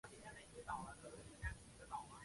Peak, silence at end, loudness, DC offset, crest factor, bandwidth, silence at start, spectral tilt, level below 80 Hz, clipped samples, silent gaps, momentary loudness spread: -32 dBFS; 0 s; -53 LUFS; under 0.1%; 20 dB; 11.5 kHz; 0.05 s; -4 dB/octave; -60 dBFS; under 0.1%; none; 7 LU